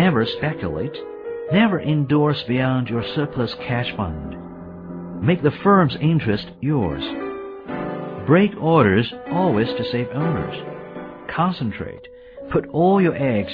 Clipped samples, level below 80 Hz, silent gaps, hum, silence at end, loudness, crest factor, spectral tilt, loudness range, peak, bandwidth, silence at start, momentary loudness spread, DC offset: under 0.1%; -46 dBFS; none; none; 0 s; -20 LUFS; 18 dB; -10 dB/octave; 4 LU; -2 dBFS; 5.2 kHz; 0 s; 17 LU; under 0.1%